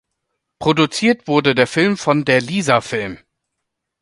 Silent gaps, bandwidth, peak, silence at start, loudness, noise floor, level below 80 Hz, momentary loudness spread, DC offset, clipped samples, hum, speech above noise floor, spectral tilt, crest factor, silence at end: none; 11.5 kHz; 0 dBFS; 0.6 s; -16 LUFS; -77 dBFS; -54 dBFS; 7 LU; under 0.1%; under 0.1%; none; 61 dB; -5 dB/octave; 18 dB; 0.85 s